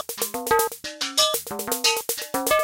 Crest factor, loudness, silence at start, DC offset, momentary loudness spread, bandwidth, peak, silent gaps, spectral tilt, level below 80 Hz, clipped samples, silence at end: 16 dB; -23 LUFS; 0 s; under 0.1%; 7 LU; 17 kHz; -8 dBFS; none; -0.5 dB/octave; -56 dBFS; under 0.1%; 0 s